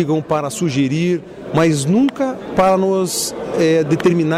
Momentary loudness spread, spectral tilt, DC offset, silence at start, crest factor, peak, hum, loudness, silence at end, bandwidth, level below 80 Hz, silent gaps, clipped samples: 6 LU; -5.5 dB/octave; under 0.1%; 0 s; 10 dB; -6 dBFS; none; -17 LUFS; 0 s; 16 kHz; -50 dBFS; none; under 0.1%